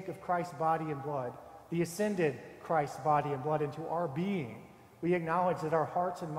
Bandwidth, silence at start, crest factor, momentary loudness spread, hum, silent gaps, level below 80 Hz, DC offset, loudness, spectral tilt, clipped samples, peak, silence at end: 16 kHz; 0 s; 18 dB; 8 LU; none; none; -70 dBFS; under 0.1%; -33 LUFS; -7 dB/octave; under 0.1%; -16 dBFS; 0 s